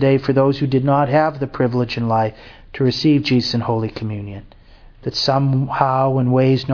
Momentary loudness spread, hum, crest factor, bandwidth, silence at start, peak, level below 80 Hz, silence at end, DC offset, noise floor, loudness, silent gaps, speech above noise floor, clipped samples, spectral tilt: 11 LU; none; 18 dB; 5.4 kHz; 0 s; 0 dBFS; -46 dBFS; 0 s; under 0.1%; -43 dBFS; -18 LUFS; none; 26 dB; under 0.1%; -7.5 dB/octave